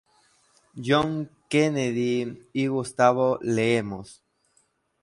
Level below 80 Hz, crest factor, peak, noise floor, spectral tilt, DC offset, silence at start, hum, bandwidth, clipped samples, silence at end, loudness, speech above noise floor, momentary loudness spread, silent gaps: -60 dBFS; 20 dB; -6 dBFS; -68 dBFS; -5.5 dB/octave; under 0.1%; 0.75 s; none; 11.5 kHz; under 0.1%; 0.9 s; -25 LUFS; 44 dB; 11 LU; none